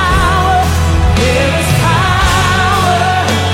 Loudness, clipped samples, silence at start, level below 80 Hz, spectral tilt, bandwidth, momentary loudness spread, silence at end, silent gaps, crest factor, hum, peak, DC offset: -11 LUFS; under 0.1%; 0 s; -20 dBFS; -4.5 dB/octave; 16.5 kHz; 1 LU; 0 s; none; 10 dB; none; 0 dBFS; under 0.1%